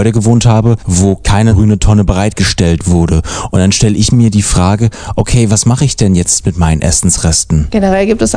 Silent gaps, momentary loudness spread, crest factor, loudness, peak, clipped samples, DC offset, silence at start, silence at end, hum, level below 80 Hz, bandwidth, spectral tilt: none; 3 LU; 8 dB; -10 LUFS; 0 dBFS; 1%; under 0.1%; 0 s; 0 s; none; -20 dBFS; 10 kHz; -5 dB/octave